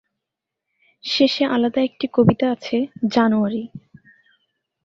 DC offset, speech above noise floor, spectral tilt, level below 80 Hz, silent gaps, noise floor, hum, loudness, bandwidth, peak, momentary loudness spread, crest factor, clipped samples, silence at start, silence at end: under 0.1%; 64 dB; -6.5 dB/octave; -60 dBFS; none; -83 dBFS; none; -19 LUFS; 7.4 kHz; -4 dBFS; 8 LU; 18 dB; under 0.1%; 1.05 s; 1.05 s